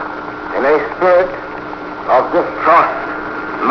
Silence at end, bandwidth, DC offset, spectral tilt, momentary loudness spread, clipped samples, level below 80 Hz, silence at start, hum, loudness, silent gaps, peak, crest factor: 0 s; 5.4 kHz; under 0.1%; -6.5 dB/octave; 14 LU; under 0.1%; -46 dBFS; 0 s; none; -15 LUFS; none; 0 dBFS; 16 dB